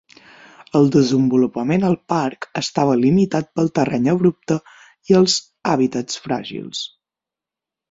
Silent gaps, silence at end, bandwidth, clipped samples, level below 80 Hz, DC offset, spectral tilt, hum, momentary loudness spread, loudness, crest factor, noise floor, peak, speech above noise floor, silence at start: none; 1.05 s; 7.8 kHz; under 0.1%; -56 dBFS; under 0.1%; -5.5 dB/octave; none; 10 LU; -18 LUFS; 18 dB; -88 dBFS; 0 dBFS; 70 dB; 0.75 s